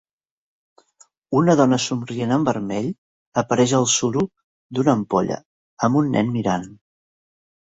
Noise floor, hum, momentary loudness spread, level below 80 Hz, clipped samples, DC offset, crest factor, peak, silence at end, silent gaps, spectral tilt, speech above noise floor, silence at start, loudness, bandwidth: -57 dBFS; none; 11 LU; -58 dBFS; under 0.1%; under 0.1%; 20 dB; -2 dBFS; 0.9 s; 2.98-3.32 s, 4.44-4.70 s, 5.45-5.77 s; -5 dB/octave; 38 dB; 1.3 s; -20 LUFS; 8.2 kHz